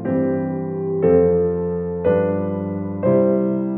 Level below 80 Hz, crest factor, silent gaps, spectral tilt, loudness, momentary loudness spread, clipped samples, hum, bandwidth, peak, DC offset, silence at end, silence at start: -48 dBFS; 16 dB; none; -13.5 dB/octave; -19 LUFS; 9 LU; under 0.1%; none; 3.3 kHz; -4 dBFS; under 0.1%; 0 s; 0 s